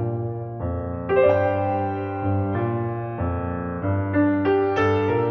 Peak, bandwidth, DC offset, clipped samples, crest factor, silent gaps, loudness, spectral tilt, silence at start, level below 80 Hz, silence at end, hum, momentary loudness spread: -6 dBFS; 6.4 kHz; under 0.1%; under 0.1%; 16 dB; none; -23 LUFS; -9.5 dB/octave; 0 s; -44 dBFS; 0 s; none; 9 LU